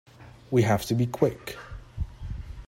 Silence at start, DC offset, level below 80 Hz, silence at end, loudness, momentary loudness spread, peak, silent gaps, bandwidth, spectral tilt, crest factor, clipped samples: 0.2 s; under 0.1%; -42 dBFS; 0 s; -27 LUFS; 16 LU; -8 dBFS; none; 16 kHz; -6.5 dB/octave; 20 dB; under 0.1%